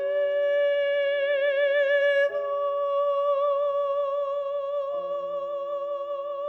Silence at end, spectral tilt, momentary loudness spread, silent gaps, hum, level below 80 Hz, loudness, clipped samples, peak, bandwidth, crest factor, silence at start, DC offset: 0 s; -3 dB/octave; 9 LU; none; none; -78 dBFS; -25 LUFS; under 0.1%; -16 dBFS; 5.8 kHz; 10 dB; 0 s; under 0.1%